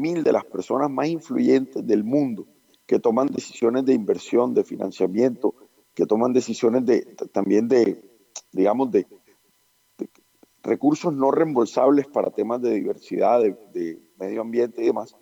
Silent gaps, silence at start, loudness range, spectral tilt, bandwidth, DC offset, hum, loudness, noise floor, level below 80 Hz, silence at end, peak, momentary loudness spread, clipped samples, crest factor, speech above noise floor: none; 0 s; 3 LU; -6.5 dB/octave; 9.4 kHz; under 0.1%; none; -22 LUFS; -64 dBFS; -78 dBFS; 0.15 s; -8 dBFS; 12 LU; under 0.1%; 14 dB; 43 dB